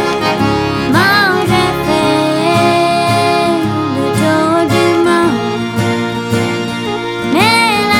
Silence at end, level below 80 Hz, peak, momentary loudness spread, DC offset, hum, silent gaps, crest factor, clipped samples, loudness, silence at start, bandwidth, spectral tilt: 0 s; -40 dBFS; 0 dBFS; 7 LU; under 0.1%; none; none; 12 dB; under 0.1%; -12 LUFS; 0 s; 18 kHz; -5 dB/octave